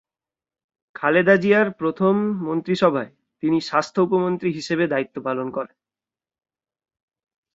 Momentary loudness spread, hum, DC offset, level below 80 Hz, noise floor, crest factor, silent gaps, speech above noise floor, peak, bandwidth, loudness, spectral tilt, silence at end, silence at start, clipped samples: 12 LU; none; under 0.1%; -66 dBFS; under -90 dBFS; 20 dB; none; over 70 dB; -2 dBFS; 7.8 kHz; -21 LUFS; -6.5 dB/octave; 1.9 s; 1 s; under 0.1%